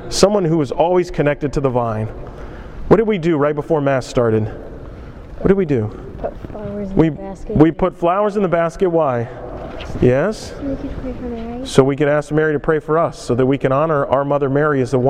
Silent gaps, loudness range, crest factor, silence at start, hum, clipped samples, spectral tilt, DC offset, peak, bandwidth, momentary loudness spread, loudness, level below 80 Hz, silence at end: none; 3 LU; 16 dB; 0 s; none; under 0.1%; -6.5 dB/octave; under 0.1%; 0 dBFS; 13.5 kHz; 15 LU; -17 LUFS; -34 dBFS; 0 s